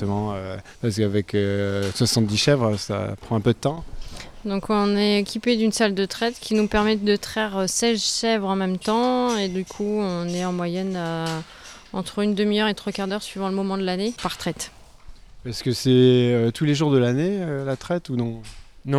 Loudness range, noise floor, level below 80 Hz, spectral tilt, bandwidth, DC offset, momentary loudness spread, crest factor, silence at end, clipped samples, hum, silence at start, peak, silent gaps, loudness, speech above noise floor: 4 LU; -43 dBFS; -46 dBFS; -5 dB/octave; 15 kHz; under 0.1%; 11 LU; 18 dB; 0 s; under 0.1%; none; 0 s; -6 dBFS; none; -23 LUFS; 20 dB